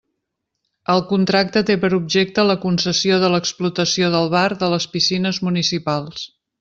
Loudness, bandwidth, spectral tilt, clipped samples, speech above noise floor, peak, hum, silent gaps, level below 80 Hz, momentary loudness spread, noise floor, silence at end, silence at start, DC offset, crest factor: -18 LUFS; 7.8 kHz; -4.5 dB/octave; under 0.1%; 59 dB; -2 dBFS; none; none; -56 dBFS; 6 LU; -77 dBFS; 0.35 s; 0.9 s; under 0.1%; 16 dB